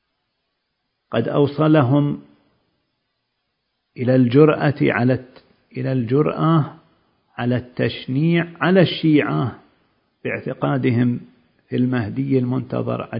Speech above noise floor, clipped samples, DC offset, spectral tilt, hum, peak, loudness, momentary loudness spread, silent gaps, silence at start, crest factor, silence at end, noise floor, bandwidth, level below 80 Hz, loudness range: 56 dB; under 0.1%; under 0.1%; -12.5 dB/octave; none; 0 dBFS; -19 LUFS; 12 LU; none; 1.1 s; 20 dB; 0 s; -74 dBFS; 5.4 kHz; -56 dBFS; 4 LU